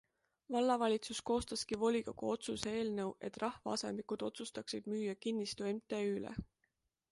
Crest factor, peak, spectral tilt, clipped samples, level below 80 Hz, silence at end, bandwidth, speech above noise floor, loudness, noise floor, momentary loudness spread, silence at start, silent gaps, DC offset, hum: 20 dB; -18 dBFS; -4.5 dB/octave; under 0.1%; -66 dBFS; 0.65 s; 11.5 kHz; 45 dB; -39 LUFS; -84 dBFS; 8 LU; 0.5 s; none; under 0.1%; none